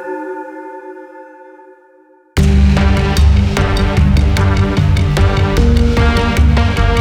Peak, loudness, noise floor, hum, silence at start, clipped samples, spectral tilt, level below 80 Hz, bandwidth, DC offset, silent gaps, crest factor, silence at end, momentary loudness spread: 0 dBFS; -13 LUFS; -47 dBFS; none; 0 s; under 0.1%; -6.5 dB/octave; -16 dBFS; 13 kHz; under 0.1%; none; 12 dB; 0 s; 16 LU